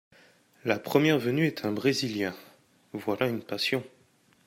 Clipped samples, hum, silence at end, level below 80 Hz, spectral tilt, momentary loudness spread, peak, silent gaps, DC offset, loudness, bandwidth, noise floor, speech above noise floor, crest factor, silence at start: under 0.1%; none; 0.6 s; -72 dBFS; -5.5 dB/octave; 11 LU; -8 dBFS; none; under 0.1%; -28 LUFS; 16 kHz; -64 dBFS; 36 dB; 22 dB; 0.65 s